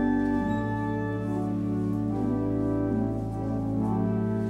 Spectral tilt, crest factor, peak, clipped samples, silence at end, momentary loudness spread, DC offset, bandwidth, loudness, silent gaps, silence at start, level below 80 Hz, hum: -9.5 dB/octave; 12 dB; -16 dBFS; under 0.1%; 0 s; 3 LU; under 0.1%; 8.6 kHz; -28 LUFS; none; 0 s; -44 dBFS; none